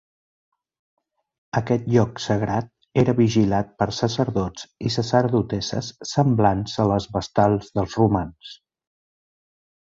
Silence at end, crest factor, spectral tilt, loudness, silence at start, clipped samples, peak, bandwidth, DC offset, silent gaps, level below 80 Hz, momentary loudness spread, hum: 1.35 s; 18 dB; -6.5 dB/octave; -22 LUFS; 1.55 s; under 0.1%; -4 dBFS; 7.8 kHz; under 0.1%; none; -46 dBFS; 9 LU; none